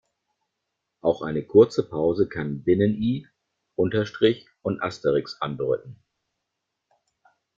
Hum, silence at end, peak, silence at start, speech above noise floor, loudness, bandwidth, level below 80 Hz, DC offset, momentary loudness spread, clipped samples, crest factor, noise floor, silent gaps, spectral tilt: none; 1.65 s; -4 dBFS; 1.05 s; 58 dB; -24 LUFS; 7.6 kHz; -58 dBFS; under 0.1%; 11 LU; under 0.1%; 22 dB; -81 dBFS; none; -7.5 dB/octave